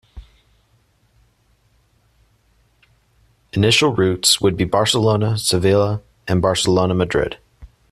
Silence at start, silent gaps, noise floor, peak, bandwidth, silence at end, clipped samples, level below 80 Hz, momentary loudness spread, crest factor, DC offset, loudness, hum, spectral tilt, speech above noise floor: 0.15 s; none; -60 dBFS; 0 dBFS; 13.5 kHz; 0.25 s; under 0.1%; -46 dBFS; 8 LU; 20 dB; under 0.1%; -17 LUFS; none; -4.5 dB/octave; 43 dB